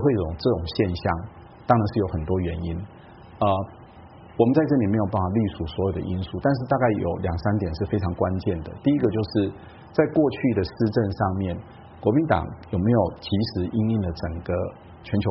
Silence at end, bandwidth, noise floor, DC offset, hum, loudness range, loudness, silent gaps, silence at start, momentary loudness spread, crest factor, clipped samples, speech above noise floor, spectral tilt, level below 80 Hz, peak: 0 s; 5.8 kHz; -46 dBFS; under 0.1%; none; 2 LU; -24 LUFS; none; 0 s; 10 LU; 20 dB; under 0.1%; 22 dB; -7 dB/octave; -44 dBFS; -4 dBFS